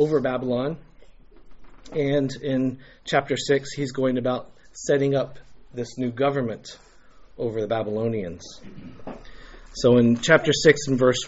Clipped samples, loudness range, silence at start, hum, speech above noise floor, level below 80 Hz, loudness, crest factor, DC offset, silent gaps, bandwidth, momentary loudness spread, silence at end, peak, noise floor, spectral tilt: under 0.1%; 7 LU; 0 s; none; 25 dB; -50 dBFS; -23 LUFS; 22 dB; under 0.1%; none; 8 kHz; 22 LU; 0 s; -2 dBFS; -48 dBFS; -4.5 dB/octave